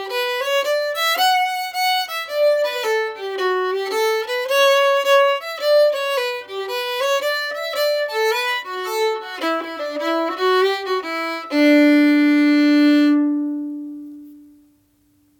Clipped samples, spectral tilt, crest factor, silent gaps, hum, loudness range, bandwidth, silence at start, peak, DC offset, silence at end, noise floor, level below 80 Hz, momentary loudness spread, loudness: under 0.1%; -1.5 dB/octave; 14 dB; none; none; 5 LU; 18.5 kHz; 0 s; -4 dBFS; under 0.1%; 1 s; -59 dBFS; -72 dBFS; 10 LU; -18 LUFS